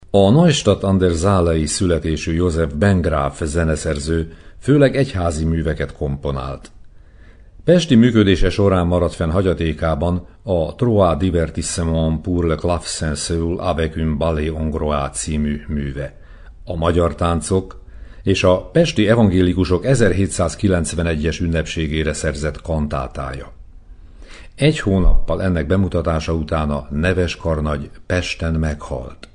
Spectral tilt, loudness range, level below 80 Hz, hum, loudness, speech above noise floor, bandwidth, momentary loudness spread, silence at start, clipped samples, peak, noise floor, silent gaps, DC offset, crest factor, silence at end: -6 dB/octave; 5 LU; -28 dBFS; none; -18 LUFS; 26 dB; 10.5 kHz; 10 LU; 0.15 s; under 0.1%; 0 dBFS; -43 dBFS; none; under 0.1%; 16 dB; 0.1 s